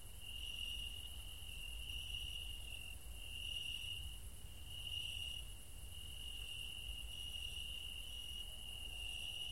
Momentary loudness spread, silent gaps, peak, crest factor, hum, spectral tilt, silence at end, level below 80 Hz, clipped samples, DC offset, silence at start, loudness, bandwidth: 8 LU; none; -34 dBFS; 14 dB; none; -1 dB/octave; 0 s; -54 dBFS; under 0.1%; 0.2%; 0 s; -47 LUFS; 16 kHz